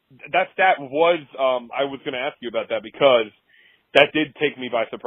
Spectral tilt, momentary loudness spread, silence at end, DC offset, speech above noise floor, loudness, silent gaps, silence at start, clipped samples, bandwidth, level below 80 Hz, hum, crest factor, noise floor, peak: -5.5 dB/octave; 10 LU; 0.1 s; under 0.1%; 36 dB; -21 LUFS; none; 0.25 s; under 0.1%; 7.4 kHz; -70 dBFS; none; 22 dB; -57 dBFS; 0 dBFS